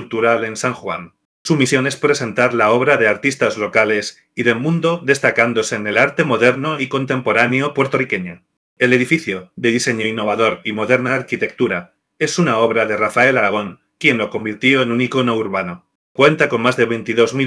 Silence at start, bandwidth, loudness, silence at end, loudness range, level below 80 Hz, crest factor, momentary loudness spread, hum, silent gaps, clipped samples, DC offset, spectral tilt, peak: 0 s; 11 kHz; -16 LUFS; 0 s; 2 LU; -64 dBFS; 16 dB; 9 LU; none; 1.25-1.45 s, 8.57-8.76 s, 15.95-16.15 s; under 0.1%; under 0.1%; -5 dB/octave; 0 dBFS